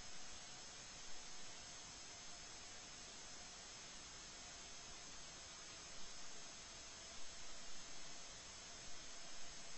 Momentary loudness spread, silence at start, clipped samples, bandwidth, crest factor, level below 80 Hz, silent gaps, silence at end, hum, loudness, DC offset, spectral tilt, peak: 0 LU; 0 s; under 0.1%; 8.2 kHz; 14 dB; -68 dBFS; none; 0 s; none; -53 LUFS; under 0.1%; -0.5 dB/octave; -38 dBFS